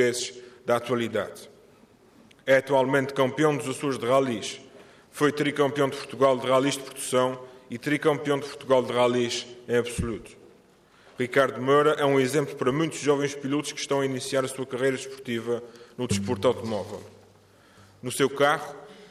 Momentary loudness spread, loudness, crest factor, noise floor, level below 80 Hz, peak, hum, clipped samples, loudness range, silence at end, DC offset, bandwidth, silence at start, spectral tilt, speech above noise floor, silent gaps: 13 LU; -26 LUFS; 18 dB; -57 dBFS; -58 dBFS; -8 dBFS; none; under 0.1%; 4 LU; 0.05 s; under 0.1%; 15 kHz; 0 s; -4.5 dB/octave; 32 dB; none